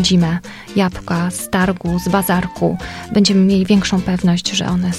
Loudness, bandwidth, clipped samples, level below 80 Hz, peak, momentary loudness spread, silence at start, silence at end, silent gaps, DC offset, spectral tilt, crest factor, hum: -16 LUFS; 14 kHz; under 0.1%; -38 dBFS; 0 dBFS; 7 LU; 0 s; 0 s; none; under 0.1%; -5 dB/octave; 16 dB; none